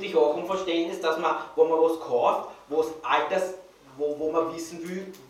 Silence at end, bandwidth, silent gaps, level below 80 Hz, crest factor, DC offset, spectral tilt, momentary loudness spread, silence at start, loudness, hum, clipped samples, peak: 0.05 s; 15 kHz; none; -68 dBFS; 18 dB; under 0.1%; -4.5 dB/octave; 11 LU; 0 s; -26 LUFS; none; under 0.1%; -8 dBFS